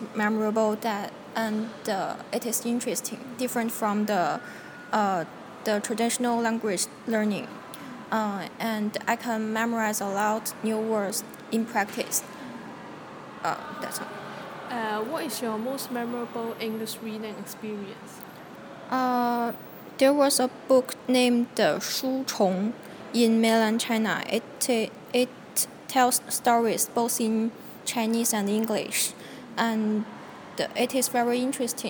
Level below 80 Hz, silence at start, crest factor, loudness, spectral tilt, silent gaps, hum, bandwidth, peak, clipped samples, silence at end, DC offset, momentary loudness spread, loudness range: -74 dBFS; 0 s; 20 dB; -27 LUFS; -3.5 dB/octave; none; none; 19 kHz; -8 dBFS; under 0.1%; 0 s; under 0.1%; 15 LU; 8 LU